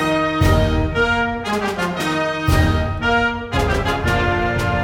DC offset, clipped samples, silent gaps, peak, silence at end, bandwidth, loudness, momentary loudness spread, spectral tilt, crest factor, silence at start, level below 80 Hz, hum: under 0.1%; under 0.1%; none; -4 dBFS; 0 s; 16.5 kHz; -18 LUFS; 4 LU; -6 dB/octave; 14 dB; 0 s; -26 dBFS; none